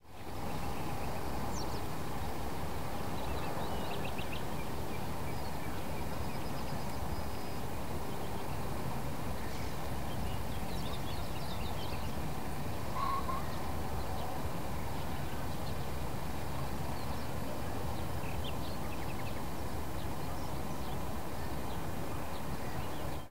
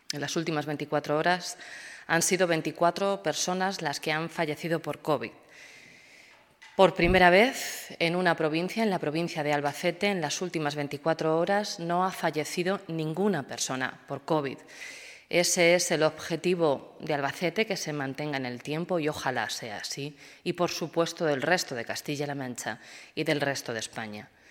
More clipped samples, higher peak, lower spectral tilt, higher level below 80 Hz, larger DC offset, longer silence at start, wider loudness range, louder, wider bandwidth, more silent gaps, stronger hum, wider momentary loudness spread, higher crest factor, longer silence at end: neither; second, -22 dBFS vs -4 dBFS; first, -5.5 dB/octave vs -4 dB/octave; first, -48 dBFS vs -54 dBFS; first, 2% vs under 0.1%; second, 0 s vs 0.15 s; second, 2 LU vs 6 LU; second, -40 LUFS vs -28 LUFS; second, 16 kHz vs 18 kHz; neither; neither; second, 2 LU vs 12 LU; second, 14 dB vs 24 dB; second, 0 s vs 0.25 s